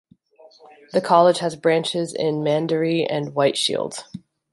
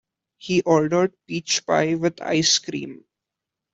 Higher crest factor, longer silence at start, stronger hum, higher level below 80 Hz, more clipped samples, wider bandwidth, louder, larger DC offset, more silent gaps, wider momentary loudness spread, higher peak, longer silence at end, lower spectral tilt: about the same, 20 dB vs 18 dB; about the same, 0.45 s vs 0.45 s; neither; about the same, -68 dBFS vs -64 dBFS; neither; first, 11.5 kHz vs 8.2 kHz; about the same, -20 LUFS vs -21 LUFS; neither; neither; about the same, 13 LU vs 13 LU; about the same, -2 dBFS vs -4 dBFS; second, 0.35 s vs 0.8 s; first, -5 dB/octave vs -3.5 dB/octave